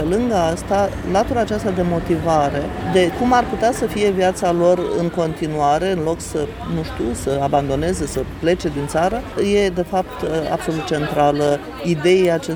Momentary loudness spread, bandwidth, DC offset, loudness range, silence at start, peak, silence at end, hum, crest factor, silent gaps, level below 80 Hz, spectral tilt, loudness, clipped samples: 7 LU; over 20 kHz; under 0.1%; 3 LU; 0 s; -4 dBFS; 0 s; none; 16 dB; none; -36 dBFS; -6 dB/octave; -19 LUFS; under 0.1%